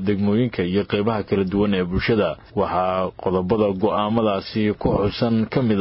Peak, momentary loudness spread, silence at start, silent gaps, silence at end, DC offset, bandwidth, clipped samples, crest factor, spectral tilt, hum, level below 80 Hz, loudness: -6 dBFS; 3 LU; 0 s; none; 0 s; under 0.1%; 5.8 kHz; under 0.1%; 14 dB; -11.5 dB/octave; none; -40 dBFS; -21 LUFS